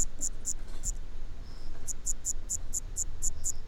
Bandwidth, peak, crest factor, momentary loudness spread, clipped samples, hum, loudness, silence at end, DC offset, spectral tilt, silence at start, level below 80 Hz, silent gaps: 13.5 kHz; -14 dBFS; 16 dB; 14 LU; under 0.1%; none; -35 LUFS; 0 s; under 0.1%; -2 dB/octave; 0 s; -36 dBFS; none